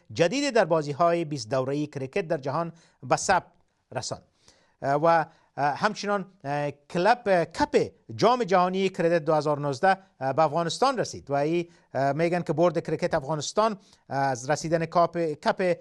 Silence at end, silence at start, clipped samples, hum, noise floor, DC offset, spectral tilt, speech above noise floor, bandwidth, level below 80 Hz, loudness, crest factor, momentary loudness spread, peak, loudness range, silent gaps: 0 s; 0.1 s; under 0.1%; none; -61 dBFS; under 0.1%; -5 dB/octave; 36 dB; 12 kHz; -62 dBFS; -26 LUFS; 18 dB; 9 LU; -8 dBFS; 4 LU; none